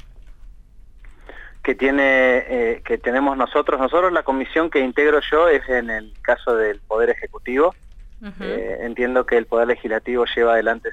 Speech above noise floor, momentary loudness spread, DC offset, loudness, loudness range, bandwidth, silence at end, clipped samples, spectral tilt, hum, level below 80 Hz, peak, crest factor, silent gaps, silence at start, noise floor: 24 dB; 10 LU; under 0.1%; -19 LUFS; 4 LU; 8 kHz; 0 s; under 0.1%; -5.5 dB/octave; none; -42 dBFS; -6 dBFS; 14 dB; none; 0.1 s; -43 dBFS